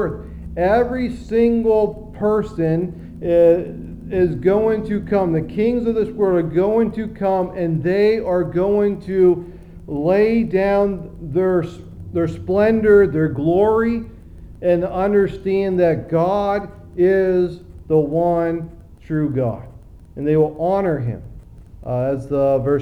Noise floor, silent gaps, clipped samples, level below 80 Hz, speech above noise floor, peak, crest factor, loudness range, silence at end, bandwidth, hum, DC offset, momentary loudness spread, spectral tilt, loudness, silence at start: -39 dBFS; none; under 0.1%; -40 dBFS; 21 dB; -2 dBFS; 16 dB; 4 LU; 0 s; 9.2 kHz; none; 0.1%; 11 LU; -9.5 dB/octave; -18 LUFS; 0 s